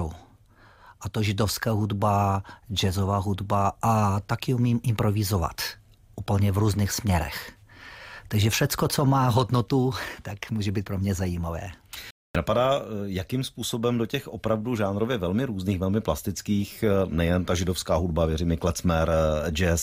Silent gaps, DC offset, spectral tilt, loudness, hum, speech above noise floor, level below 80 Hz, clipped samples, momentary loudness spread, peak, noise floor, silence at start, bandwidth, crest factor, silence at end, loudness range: 12.11-12.34 s; under 0.1%; -5.5 dB/octave; -26 LUFS; none; 30 dB; -44 dBFS; under 0.1%; 10 LU; -10 dBFS; -55 dBFS; 0 s; 16 kHz; 14 dB; 0 s; 3 LU